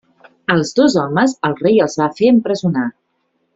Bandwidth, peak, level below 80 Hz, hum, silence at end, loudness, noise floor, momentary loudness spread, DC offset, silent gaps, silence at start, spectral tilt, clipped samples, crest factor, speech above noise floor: 8 kHz; -2 dBFS; -56 dBFS; none; 0.65 s; -15 LUFS; -66 dBFS; 6 LU; under 0.1%; none; 0.5 s; -6 dB/octave; under 0.1%; 14 dB; 52 dB